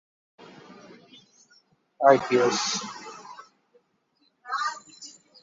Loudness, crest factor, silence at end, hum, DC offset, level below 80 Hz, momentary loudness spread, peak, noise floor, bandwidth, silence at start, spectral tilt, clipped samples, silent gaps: -24 LUFS; 24 dB; 0.3 s; none; under 0.1%; -74 dBFS; 28 LU; -4 dBFS; -69 dBFS; 7.8 kHz; 0.7 s; -3 dB/octave; under 0.1%; none